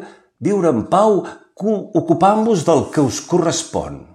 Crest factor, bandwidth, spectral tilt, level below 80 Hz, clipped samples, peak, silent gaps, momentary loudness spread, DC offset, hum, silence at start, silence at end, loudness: 16 dB; 12.5 kHz; -5.5 dB/octave; -50 dBFS; under 0.1%; -2 dBFS; none; 10 LU; under 0.1%; none; 0 s; 0.15 s; -17 LUFS